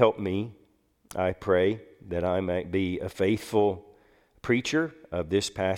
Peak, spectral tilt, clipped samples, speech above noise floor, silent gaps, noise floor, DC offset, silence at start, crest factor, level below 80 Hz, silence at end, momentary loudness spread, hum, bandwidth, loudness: -6 dBFS; -5.5 dB/octave; under 0.1%; 38 dB; none; -65 dBFS; under 0.1%; 0 s; 22 dB; -56 dBFS; 0 s; 11 LU; none; 16.5 kHz; -28 LUFS